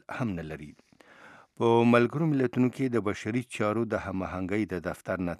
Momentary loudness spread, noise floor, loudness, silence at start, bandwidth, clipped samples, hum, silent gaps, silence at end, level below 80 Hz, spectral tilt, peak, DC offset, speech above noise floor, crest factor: 11 LU; -54 dBFS; -28 LUFS; 0.1 s; 12.5 kHz; under 0.1%; none; none; 0.05 s; -58 dBFS; -7.5 dB/octave; -8 dBFS; under 0.1%; 26 dB; 22 dB